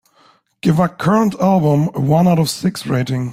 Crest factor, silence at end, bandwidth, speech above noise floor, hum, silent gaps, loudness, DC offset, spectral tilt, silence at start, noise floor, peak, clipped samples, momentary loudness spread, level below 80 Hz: 14 dB; 0 s; 16 kHz; 39 dB; none; none; -16 LUFS; under 0.1%; -7 dB/octave; 0.65 s; -53 dBFS; -2 dBFS; under 0.1%; 6 LU; -50 dBFS